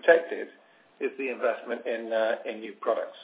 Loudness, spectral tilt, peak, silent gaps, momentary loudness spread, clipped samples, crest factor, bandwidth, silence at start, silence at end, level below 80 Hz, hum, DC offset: -29 LUFS; -7 dB/octave; -6 dBFS; none; 12 LU; under 0.1%; 22 dB; 4 kHz; 0.05 s; 0 s; -90 dBFS; none; under 0.1%